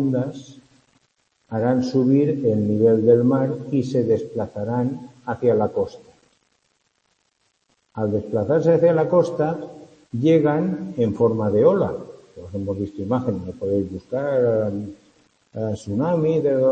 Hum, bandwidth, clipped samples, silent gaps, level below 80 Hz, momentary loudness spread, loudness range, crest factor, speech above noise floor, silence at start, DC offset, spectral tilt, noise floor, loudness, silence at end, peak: none; 8.6 kHz; under 0.1%; none; -58 dBFS; 14 LU; 7 LU; 18 dB; 49 dB; 0 s; under 0.1%; -9 dB/octave; -69 dBFS; -21 LUFS; 0 s; -4 dBFS